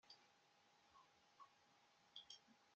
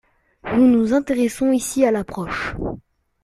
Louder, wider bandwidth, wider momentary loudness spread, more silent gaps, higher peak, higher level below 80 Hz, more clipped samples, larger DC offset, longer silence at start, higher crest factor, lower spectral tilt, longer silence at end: second, -64 LUFS vs -19 LUFS; second, 7.6 kHz vs 13.5 kHz; second, 9 LU vs 14 LU; neither; second, -44 dBFS vs -4 dBFS; second, under -90 dBFS vs -44 dBFS; neither; neither; second, 0.05 s vs 0.45 s; first, 26 dB vs 16 dB; second, 1 dB/octave vs -5.5 dB/octave; second, 0 s vs 0.45 s